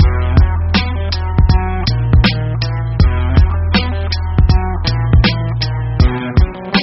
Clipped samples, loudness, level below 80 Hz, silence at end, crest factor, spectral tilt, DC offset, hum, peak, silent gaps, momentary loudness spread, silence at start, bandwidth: under 0.1%; -15 LUFS; -16 dBFS; 0 s; 12 dB; -5.5 dB/octave; under 0.1%; none; 0 dBFS; none; 6 LU; 0 s; 6 kHz